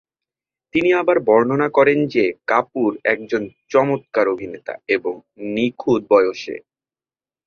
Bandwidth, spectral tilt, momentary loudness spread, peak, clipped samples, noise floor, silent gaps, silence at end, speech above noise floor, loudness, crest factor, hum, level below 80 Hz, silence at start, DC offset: 6.8 kHz; -6.5 dB/octave; 13 LU; -2 dBFS; under 0.1%; under -90 dBFS; none; 0.9 s; over 72 dB; -18 LUFS; 18 dB; none; -60 dBFS; 0.75 s; under 0.1%